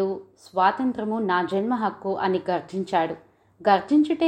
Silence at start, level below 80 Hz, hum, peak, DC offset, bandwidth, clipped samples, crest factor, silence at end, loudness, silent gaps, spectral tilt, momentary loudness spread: 0 s; -68 dBFS; none; -6 dBFS; under 0.1%; 9.2 kHz; under 0.1%; 18 dB; 0 s; -24 LUFS; none; -7 dB/octave; 8 LU